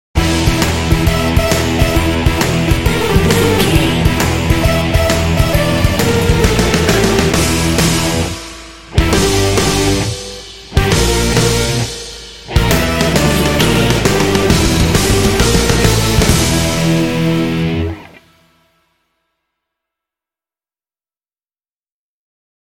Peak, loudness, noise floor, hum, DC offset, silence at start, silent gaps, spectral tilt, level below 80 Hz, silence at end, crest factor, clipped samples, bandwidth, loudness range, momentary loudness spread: 0 dBFS; -13 LUFS; under -90 dBFS; none; under 0.1%; 0.15 s; 21.68-21.86 s; -4.5 dB/octave; -22 dBFS; 0.5 s; 14 dB; under 0.1%; 17 kHz; 4 LU; 7 LU